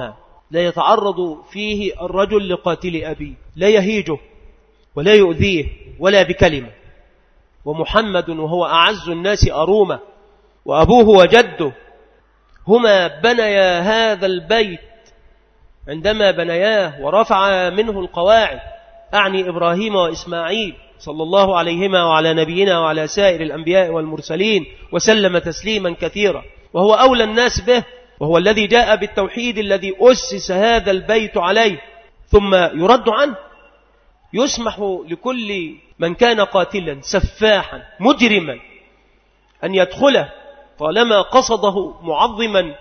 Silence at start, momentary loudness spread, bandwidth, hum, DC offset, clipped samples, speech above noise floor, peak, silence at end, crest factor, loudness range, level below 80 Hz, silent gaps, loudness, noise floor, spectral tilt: 0 s; 12 LU; 6.6 kHz; none; under 0.1%; under 0.1%; 40 dB; 0 dBFS; 0.05 s; 16 dB; 5 LU; -36 dBFS; none; -15 LUFS; -55 dBFS; -4.5 dB/octave